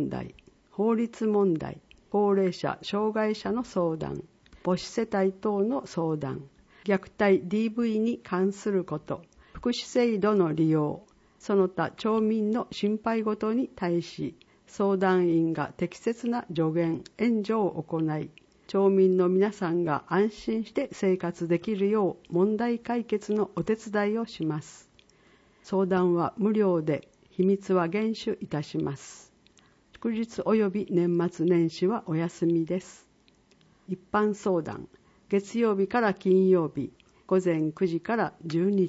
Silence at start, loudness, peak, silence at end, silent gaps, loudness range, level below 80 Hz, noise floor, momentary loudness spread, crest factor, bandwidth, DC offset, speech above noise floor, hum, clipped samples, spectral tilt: 0 s; -27 LUFS; -12 dBFS; 0 s; none; 4 LU; -62 dBFS; -62 dBFS; 10 LU; 16 dB; 8 kHz; under 0.1%; 36 dB; none; under 0.1%; -7 dB/octave